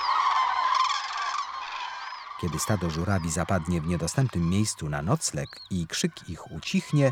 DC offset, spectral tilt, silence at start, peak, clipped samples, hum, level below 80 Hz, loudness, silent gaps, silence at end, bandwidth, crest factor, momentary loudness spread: under 0.1%; -4.5 dB/octave; 0 s; -8 dBFS; under 0.1%; none; -48 dBFS; -28 LUFS; none; 0 s; 17 kHz; 18 dB; 11 LU